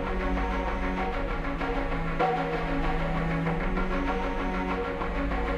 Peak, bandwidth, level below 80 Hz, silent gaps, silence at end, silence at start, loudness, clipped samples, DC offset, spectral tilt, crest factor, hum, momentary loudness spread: -12 dBFS; 8.6 kHz; -32 dBFS; none; 0 s; 0 s; -30 LUFS; under 0.1%; under 0.1%; -7.5 dB/octave; 14 dB; none; 3 LU